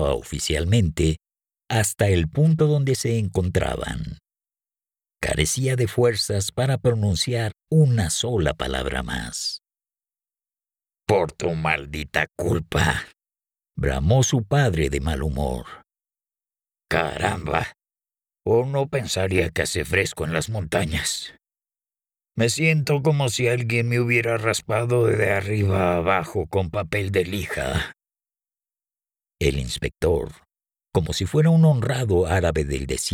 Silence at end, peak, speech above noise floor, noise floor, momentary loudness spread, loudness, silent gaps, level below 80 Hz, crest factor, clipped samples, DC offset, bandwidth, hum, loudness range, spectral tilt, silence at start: 0 s; -6 dBFS; over 68 dB; under -90 dBFS; 8 LU; -22 LUFS; none; -38 dBFS; 16 dB; under 0.1%; under 0.1%; 17 kHz; none; 6 LU; -5 dB/octave; 0 s